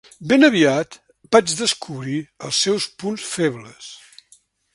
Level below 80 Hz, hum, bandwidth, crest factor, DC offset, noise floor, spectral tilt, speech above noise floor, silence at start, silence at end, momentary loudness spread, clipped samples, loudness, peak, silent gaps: -62 dBFS; none; 11.5 kHz; 20 dB; under 0.1%; -56 dBFS; -3.5 dB/octave; 37 dB; 0.2 s; 0.8 s; 19 LU; under 0.1%; -19 LUFS; 0 dBFS; none